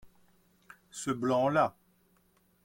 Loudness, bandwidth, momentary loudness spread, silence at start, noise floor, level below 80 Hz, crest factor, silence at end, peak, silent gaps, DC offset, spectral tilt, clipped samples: -30 LUFS; 16.5 kHz; 12 LU; 0.05 s; -69 dBFS; -70 dBFS; 20 dB; 0.95 s; -14 dBFS; none; under 0.1%; -5.5 dB/octave; under 0.1%